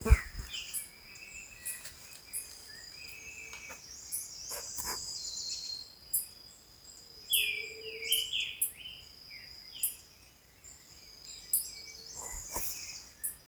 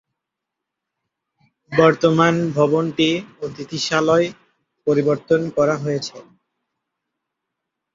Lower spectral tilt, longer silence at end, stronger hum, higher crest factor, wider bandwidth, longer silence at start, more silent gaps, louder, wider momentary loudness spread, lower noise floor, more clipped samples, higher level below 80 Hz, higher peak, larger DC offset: second, -1.5 dB/octave vs -5.5 dB/octave; second, 0 s vs 1.75 s; neither; first, 30 dB vs 20 dB; first, over 20 kHz vs 7.8 kHz; second, 0 s vs 1.7 s; neither; second, -36 LUFS vs -18 LUFS; first, 19 LU vs 11 LU; second, -60 dBFS vs -83 dBFS; neither; first, -42 dBFS vs -60 dBFS; second, -8 dBFS vs -2 dBFS; neither